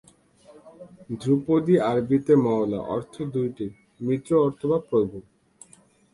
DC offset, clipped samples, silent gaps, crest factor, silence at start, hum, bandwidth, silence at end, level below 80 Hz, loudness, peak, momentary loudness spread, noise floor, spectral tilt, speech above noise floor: under 0.1%; under 0.1%; none; 18 dB; 0.65 s; none; 11.5 kHz; 0.9 s; -60 dBFS; -24 LUFS; -8 dBFS; 13 LU; -57 dBFS; -8.5 dB/octave; 33 dB